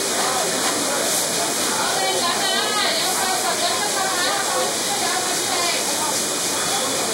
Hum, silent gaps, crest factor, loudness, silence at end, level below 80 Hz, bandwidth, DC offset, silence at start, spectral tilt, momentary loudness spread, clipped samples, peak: none; none; 14 dB; -19 LUFS; 0 s; -64 dBFS; 16 kHz; under 0.1%; 0 s; -0.5 dB/octave; 2 LU; under 0.1%; -8 dBFS